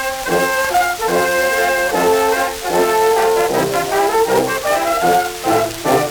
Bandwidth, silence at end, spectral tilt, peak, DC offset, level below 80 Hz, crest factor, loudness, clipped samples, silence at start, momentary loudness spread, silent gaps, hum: over 20 kHz; 0 s; -3 dB/octave; 0 dBFS; under 0.1%; -44 dBFS; 14 dB; -15 LUFS; under 0.1%; 0 s; 3 LU; none; none